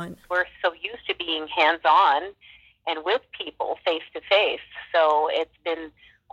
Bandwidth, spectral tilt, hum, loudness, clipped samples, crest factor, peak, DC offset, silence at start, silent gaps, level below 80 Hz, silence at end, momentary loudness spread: 9.6 kHz; -4 dB/octave; none; -24 LUFS; under 0.1%; 18 dB; -6 dBFS; under 0.1%; 0 s; none; -64 dBFS; 0.45 s; 14 LU